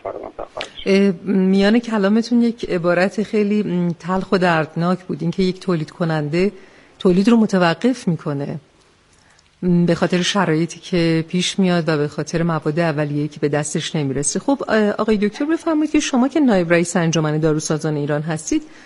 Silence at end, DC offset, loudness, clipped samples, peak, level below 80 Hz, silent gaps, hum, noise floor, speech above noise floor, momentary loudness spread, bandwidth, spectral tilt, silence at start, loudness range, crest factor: 0.05 s; under 0.1%; -18 LUFS; under 0.1%; -2 dBFS; -48 dBFS; none; none; -53 dBFS; 36 dB; 7 LU; 11.5 kHz; -5.5 dB/octave; 0.05 s; 2 LU; 16 dB